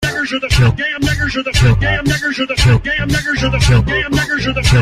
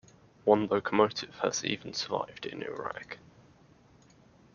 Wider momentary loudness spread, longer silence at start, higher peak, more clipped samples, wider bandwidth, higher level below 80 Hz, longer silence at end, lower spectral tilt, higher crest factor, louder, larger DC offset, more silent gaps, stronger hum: second, 4 LU vs 13 LU; second, 0 s vs 0.45 s; first, -2 dBFS vs -8 dBFS; neither; first, 15 kHz vs 7.2 kHz; first, -22 dBFS vs -70 dBFS; second, 0 s vs 1.4 s; first, -5 dB/octave vs -3 dB/octave; second, 12 dB vs 24 dB; first, -14 LUFS vs -31 LUFS; neither; neither; neither